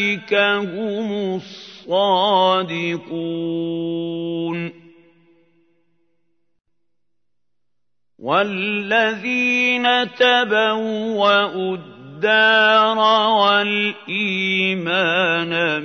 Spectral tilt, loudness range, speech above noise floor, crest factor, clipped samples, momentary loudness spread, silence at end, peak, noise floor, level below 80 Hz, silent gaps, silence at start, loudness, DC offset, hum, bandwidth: -5 dB/octave; 12 LU; 64 dB; 18 dB; under 0.1%; 11 LU; 0 s; -2 dBFS; -82 dBFS; -74 dBFS; none; 0 s; -18 LUFS; under 0.1%; 60 Hz at -60 dBFS; 6.6 kHz